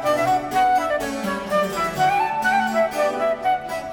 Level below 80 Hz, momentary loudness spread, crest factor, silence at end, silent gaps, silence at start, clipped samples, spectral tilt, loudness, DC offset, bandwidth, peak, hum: -50 dBFS; 5 LU; 12 dB; 0 s; none; 0 s; under 0.1%; -4 dB/octave; -21 LUFS; under 0.1%; 19 kHz; -8 dBFS; none